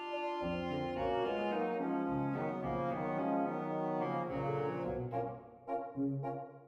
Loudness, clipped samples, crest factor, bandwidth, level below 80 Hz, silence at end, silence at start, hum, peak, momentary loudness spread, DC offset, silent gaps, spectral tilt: -37 LUFS; under 0.1%; 14 dB; 7.8 kHz; -62 dBFS; 0 s; 0 s; none; -24 dBFS; 5 LU; under 0.1%; none; -8.5 dB/octave